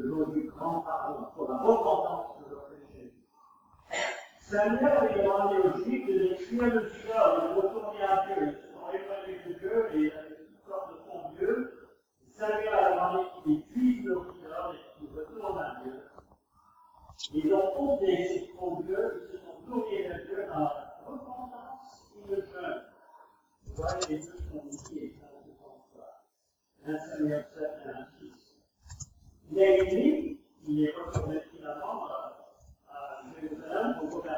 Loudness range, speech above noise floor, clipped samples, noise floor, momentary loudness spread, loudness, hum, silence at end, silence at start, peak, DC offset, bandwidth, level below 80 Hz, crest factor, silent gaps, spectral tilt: 11 LU; 51 dB; under 0.1%; -78 dBFS; 19 LU; -31 LUFS; none; 0 s; 0 s; -10 dBFS; under 0.1%; 19 kHz; -58 dBFS; 22 dB; none; -6 dB/octave